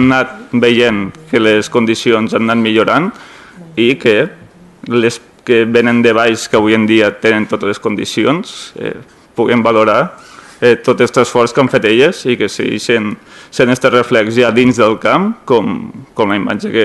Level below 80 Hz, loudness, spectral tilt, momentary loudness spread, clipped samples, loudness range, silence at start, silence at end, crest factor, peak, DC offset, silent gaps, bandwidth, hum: -48 dBFS; -12 LUFS; -5 dB/octave; 11 LU; 0.1%; 2 LU; 0 s; 0 s; 12 dB; 0 dBFS; under 0.1%; none; 12.5 kHz; none